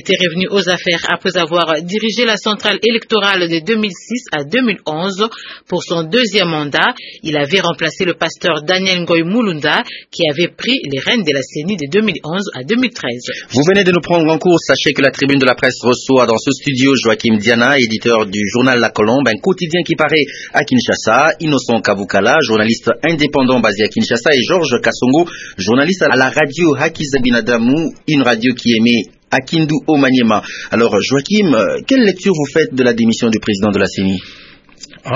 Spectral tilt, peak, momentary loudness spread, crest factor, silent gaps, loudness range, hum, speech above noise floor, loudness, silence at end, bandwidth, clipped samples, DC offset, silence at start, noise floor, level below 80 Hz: -4.5 dB/octave; 0 dBFS; 6 LU; 14 dB; none; 3 LU; none; 25 dB; -13 LUFS; 0 s; 7.8 kHz; under 0.1%; under 0.1%; 0.05 s; -38 dBFS; -48 dBFS